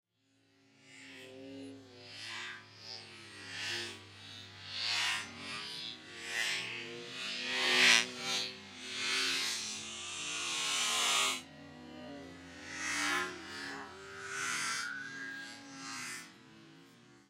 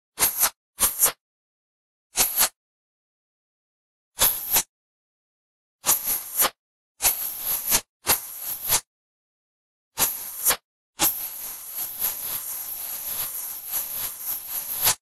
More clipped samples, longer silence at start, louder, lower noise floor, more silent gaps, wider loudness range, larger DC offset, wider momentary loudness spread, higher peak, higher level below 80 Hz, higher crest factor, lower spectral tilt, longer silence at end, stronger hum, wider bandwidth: neither; first, 0.8 s vs 0.15 s; second, -34 LUFS vs -23 LUFS; second, -73 dBFS vs under -90 dBFS; second, none vs 0.56-0.73 s, 1.21-2.10 s, 2.56-4.12 s, 4.69-5.79 s, 6.59-6.95 s, 7.89-8.00 s, 8.87-9.91 s, 10.64-10.93 s; first, 13 LU vs 4 LU; neither; first, 20 LU vs 10 LU; second, -8 dBFS vs -4 dBFS; second, -78 dBFS vs -54 dBFS; first, 30 dB vs 24 dB; about the same, 0 dB/octave vs 0.5 dB/octave; about the same, 0.1 s vs 0.05 s; neither; about the same, 16 kHz vs 16 kHz